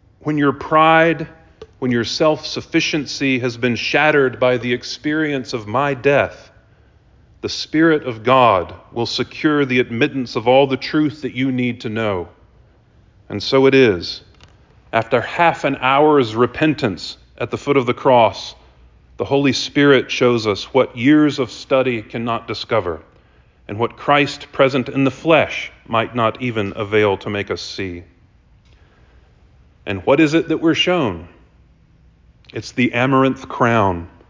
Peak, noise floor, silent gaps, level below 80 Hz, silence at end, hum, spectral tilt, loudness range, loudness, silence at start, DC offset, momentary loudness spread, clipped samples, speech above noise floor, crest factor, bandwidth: -2 dBFS; -51 dBFS; none; -48 dBFS; 0.2 s; none; -5.5 dB/octave; 4 LU; -17 LUFS; 0.25 s; under 0.1%; 13 LU; under 0.1%; 34 dB; 16 dB; 7.6 kHz